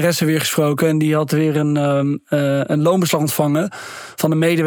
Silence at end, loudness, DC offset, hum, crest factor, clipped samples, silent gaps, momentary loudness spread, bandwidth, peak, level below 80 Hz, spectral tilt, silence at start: 0 s; -17 LUFS; under 0.1%; none; 14 dB; under 0.1%; none; 5 LU; 19.5 kHz; -2 dBFS; -70 dBFS; -5.5 dB/octave; 0 s